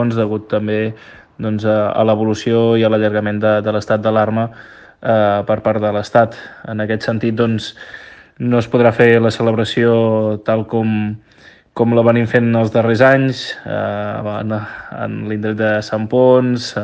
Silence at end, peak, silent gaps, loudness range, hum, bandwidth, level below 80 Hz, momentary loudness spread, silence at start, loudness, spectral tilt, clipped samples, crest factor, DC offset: 0 s; 0 dBFS; none; 3 LU; none; 8.8 kHz; -54 dBFS; 12 LU; 0 s; -15 LUFS; -7 dB/octave; under 0.1%; 16 dB; under 0.1%